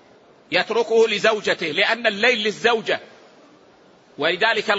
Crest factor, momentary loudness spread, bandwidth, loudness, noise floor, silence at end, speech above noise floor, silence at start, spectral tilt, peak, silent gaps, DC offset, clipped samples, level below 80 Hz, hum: 18 dB; 5 LU; 8 kHz; -19 LUFS; -52 dBFS; 0 s; 32 dB; 0.5 s; -3 dB/octave; -2 dBFS; none; under 0.1%; under 0.1%; -72 dBFS; none